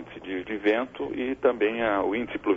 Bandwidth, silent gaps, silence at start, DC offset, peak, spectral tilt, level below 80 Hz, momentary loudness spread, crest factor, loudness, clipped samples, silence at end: 7.2 kHz; none; 0 s; under 0.1%; -10 dBFS; -7 dB/octave; -56 dBFS; 8 LU; 16 dB; -27 LUFS; under 0.1%; 0 s